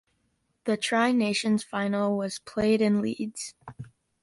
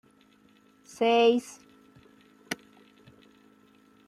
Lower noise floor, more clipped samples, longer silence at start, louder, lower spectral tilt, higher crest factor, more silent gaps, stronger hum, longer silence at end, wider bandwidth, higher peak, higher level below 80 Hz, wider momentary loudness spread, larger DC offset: first, -73 dBFS vs -61 dBFS; neither; second, 0.65 s vs 1 s; about the same, -26 LUFS vs -26 LUFS; first, -5 dB/octave vs -3.5 dB/octave; about the same, 16 dB vs 20 dB; neither; neither; second, 0.35 s vs 1.55 s; second, 11.5 kHz vs 14.5 kHz; about the same, -12 dBFS vs -12 dBFS; first, -62 dBFS vs -78 dBFS; second, 18 LU vs 24 LU; neither